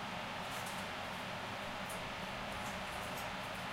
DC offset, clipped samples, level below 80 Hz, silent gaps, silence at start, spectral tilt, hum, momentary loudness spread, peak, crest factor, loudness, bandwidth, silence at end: under 0.1%; under 0.1%; -62 dBFS; none; 0 s; -3.5 dB/octave; none; 1 LU; -30 dBFS; 12 dB; -42 LUFS; 16 kHz; 0 s